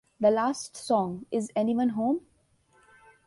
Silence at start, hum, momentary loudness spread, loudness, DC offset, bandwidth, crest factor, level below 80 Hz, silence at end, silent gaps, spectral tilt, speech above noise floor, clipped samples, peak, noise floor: 0.2 s; none; 8 LU; -28 LUFS; under 0.1%; 11.5 kHz; 18 dB; -68 dBFS; 1.05 s; none; -5.5 dB/octave; 39 dB; under 0.1%; -10 dBFS; -65 dBFS